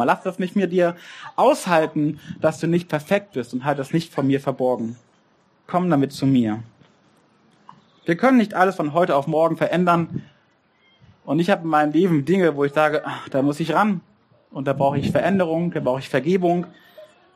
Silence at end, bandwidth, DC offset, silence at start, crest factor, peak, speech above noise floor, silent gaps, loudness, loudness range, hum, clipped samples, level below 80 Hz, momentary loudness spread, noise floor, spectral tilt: 0.3 s; 15 kHz; under 0.1%; 0 s; 18 dB; -2 dBFS; 40 dB; none; -21 LUFS; 3 LU; none; under 0.1%; -62 dBFS; 8 LU; -60 dBFS; -7 dB/octave